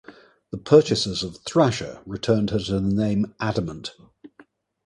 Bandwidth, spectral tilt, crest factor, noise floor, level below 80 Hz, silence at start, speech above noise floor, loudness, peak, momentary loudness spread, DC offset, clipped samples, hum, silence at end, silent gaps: 11 kHz; -6 dB/octave; 22 dB; -55 dBFS; -48 dBFS; 0.1 s; 33 dB; -22 LUFS; -2 dBFS; 17 LU; under 0.1%; under 0.1%; none; 0.6 s; none